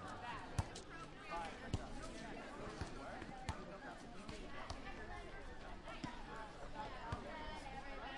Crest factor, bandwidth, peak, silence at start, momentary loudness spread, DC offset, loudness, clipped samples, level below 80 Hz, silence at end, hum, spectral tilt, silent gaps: 26 dB; 11.5 kHz; -24 dBFS; 0 s; 6 LU; under 0.1%; -50 LUFS; under 0.1%; -56 dBFS; 0 s; none; -5 dB/octave; none